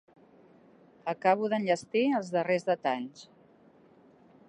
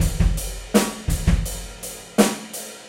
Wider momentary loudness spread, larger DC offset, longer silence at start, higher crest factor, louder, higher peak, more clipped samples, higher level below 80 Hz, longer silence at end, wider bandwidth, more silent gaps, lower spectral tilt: about the same, 10 LU vs 12 LU; neither; first, 1.05 s vs 0 s; about the same, 22 dB vs 20 dB; second, -29 LUFS vs -23 LUFS; second, -10 dBFS vs -2 dBFS; neither; second, -82 dBFS vs -26 dBFS; first, 1.25 s vs 0 s; second, 10.5 kHz vs 16 kHz; neither; about the same, -5.5 dB/octave vs -5 dB/octave